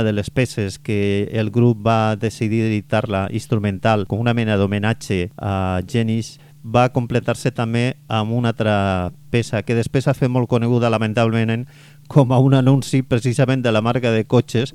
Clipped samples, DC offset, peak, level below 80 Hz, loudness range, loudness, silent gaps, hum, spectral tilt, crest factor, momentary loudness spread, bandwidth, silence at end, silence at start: under 0.1%; under 0.1%; 0 dBFS; -48 dBFS; 3 LU; -19 LUFS; none; none; -7 dB/octave; 18 dB; 6 LU; 13 kHz; 0.05 s; 0 s